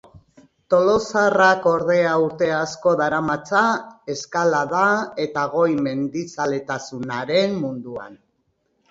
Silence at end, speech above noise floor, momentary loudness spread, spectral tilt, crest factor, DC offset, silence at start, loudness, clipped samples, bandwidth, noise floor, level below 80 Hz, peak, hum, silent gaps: 0.75 s; 49 dB; 11 LU; -5 dB/octave; 18 dB; under 0.1%; 0.7 s; -20 LUFS; under 0.1%; 7.8 kHz; -69 dBFS; -58 dBFS; -2 dBFS; none; none